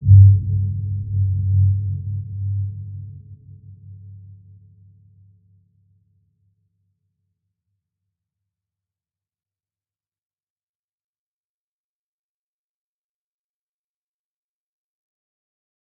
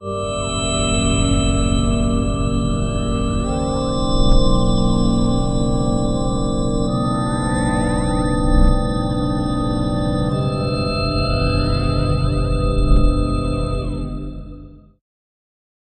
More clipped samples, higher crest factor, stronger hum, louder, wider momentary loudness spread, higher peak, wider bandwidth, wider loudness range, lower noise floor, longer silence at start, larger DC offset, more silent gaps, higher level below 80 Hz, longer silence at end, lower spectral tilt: neither; first, 22 dB vs 16 dB; neither; about the same, -19 LUFS vs -19 LUFS; first, 29 LU vs 4 LU; about the same, -2 dBFS vs -2 dBFS; second, 0.5 kHz vs 9.2 kHz; first, 27 LU vs 2 LU; first, under -90 dBFS vs -38 dBFS; about the same, 0 s vs 0 s; neither; neither; second, -46 dBFS vs -22 dBFS; first, 11.8 s vs 1.2 s; first, -18.5 dB/octave vs -6 dB/octave